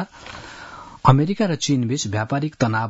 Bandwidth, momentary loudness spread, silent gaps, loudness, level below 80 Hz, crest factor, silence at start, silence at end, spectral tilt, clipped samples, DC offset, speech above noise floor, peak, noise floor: 8 kHz; 20 LU; none; -20 LUFS; -50 dBFS; 20 dB; 0 s; 0 s; -5.5 dB/octave; under 0.1%; under 0.1%; 19 dB; 0 dBFS; -39 dBFS